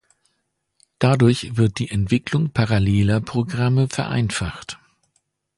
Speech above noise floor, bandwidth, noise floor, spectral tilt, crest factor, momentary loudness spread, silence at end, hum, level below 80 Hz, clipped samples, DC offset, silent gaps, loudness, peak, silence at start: 54 dB; 11.5 kHz; -73 dBFS; -6.5 dB/octave; 18 dB; 9 LU; 0.8 s; none; -42 dBFS; under 0.1%; under 0.1%; none; -20 LUFS; -2 dBFS; 1 s